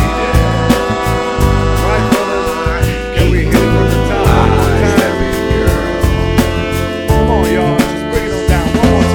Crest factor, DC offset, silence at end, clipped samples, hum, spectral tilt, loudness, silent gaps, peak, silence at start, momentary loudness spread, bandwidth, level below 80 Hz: 12 dB; under 0.1%; 0 s; under 0.1%; none; -6 dB/octave; -13 LUFS; none; 0 dBFS; 0 s; 5 LU; 19 kHz; -18 dBFS